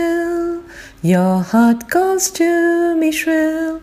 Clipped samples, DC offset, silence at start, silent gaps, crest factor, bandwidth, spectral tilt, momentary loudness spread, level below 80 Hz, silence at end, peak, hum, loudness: under 0.1%; under 0.1%; 0 s; none; 12 dB; 15.5 kHz; -5 dB/octave; 7 LU; -48 dBFS; 0 s; -2 dBFS; none; -16 LUFS